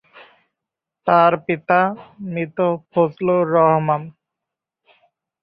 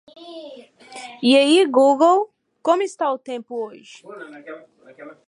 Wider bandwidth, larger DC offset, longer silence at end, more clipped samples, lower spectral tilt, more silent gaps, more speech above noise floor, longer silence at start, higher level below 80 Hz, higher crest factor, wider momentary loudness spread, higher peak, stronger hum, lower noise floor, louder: second, 5.2 kHz vs 11 kHz; neither; first, 1.3 s vs 0.2 s; neither; first, -11 dB/octave vs -3 dB/octave; neither; first, 67 dB vs 23 dB; first, 1.05 s vs 0.2 s; first, -64 dBFS vs -80 dBFS; about the same, 18 dB vs 18 dB; second, 12 LU vs 25 LU; about the same, -2 dBFS vs -2 dBFS; neither; first, -84 dBFS vs -42 dBFS; about the same, -18 LUFS vs -18 LUFS